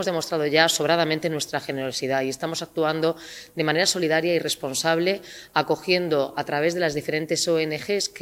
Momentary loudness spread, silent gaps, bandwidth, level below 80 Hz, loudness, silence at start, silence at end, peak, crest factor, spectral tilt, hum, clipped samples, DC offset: 7 LU; none; 16 kHz; -64 dBFS; -23 LUFS; 0 s; 0 s; -2 dBFS; 22 dB; -3.5 dB/octave; none; under 0.1%; under 0.1%